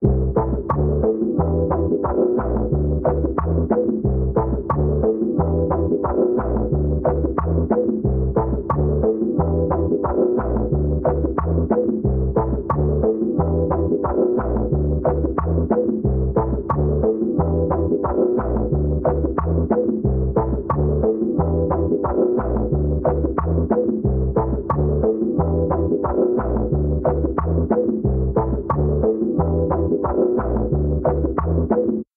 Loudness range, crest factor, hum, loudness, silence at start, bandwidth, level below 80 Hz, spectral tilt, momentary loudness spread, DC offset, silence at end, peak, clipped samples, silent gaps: 0 LU; 14 dB; none; -20 LUFS; 0 s; 2.4 kHz; -26 dBFS; -13 dB/octave; 2 LU; under 0.1%; 0.15 s; -4 dBFS; under 0.1%; none